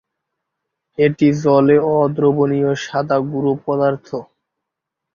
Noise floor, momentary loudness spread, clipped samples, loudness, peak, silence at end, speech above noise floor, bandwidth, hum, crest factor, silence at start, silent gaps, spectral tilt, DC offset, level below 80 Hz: -81 dBFS; 10 LU; under 0.1%; -16 LUFS; -2 dBFS; 0.9 s; 65 dB; 7.2 kHz; none; 16 dB; 1 s; none; -7.5 dB/octave; under 0.1%; -56 dBFS